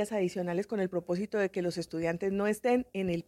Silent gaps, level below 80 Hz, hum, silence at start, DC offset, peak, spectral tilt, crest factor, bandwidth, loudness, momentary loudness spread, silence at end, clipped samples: none; -64 dBFS; none; 0 s; under 0.1%; -16 dBFS; -6.5 dB/octave; 14 dB; 15.5 kHz; -32 LUFS; 4 LU; 0.05 s; under 0.1%